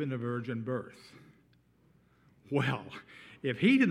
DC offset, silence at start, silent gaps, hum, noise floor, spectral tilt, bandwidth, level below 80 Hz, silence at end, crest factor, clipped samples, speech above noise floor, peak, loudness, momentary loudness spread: under 0.1%; 0 s; none; 60 Hz at -65 dBFS; -66 dBFS; -7 dB/octave; 11 kHz; -76 dBFS; 0 s; 18 dB; under 0.1%; 35 dB; -14 dBFS; -32 LUFS; 22 LU